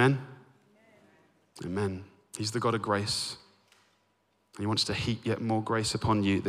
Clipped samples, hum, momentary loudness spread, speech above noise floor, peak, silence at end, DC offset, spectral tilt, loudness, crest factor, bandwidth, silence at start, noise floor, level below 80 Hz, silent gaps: under 0.1%; none; 15 LU; 43 dB; -12 dBFS; 0 s; under 0.1%; -5 dB/octave; -30 LUFS; 20 dB; 15 kHz; 0 s; -72 dBFS; -58 dBFS; none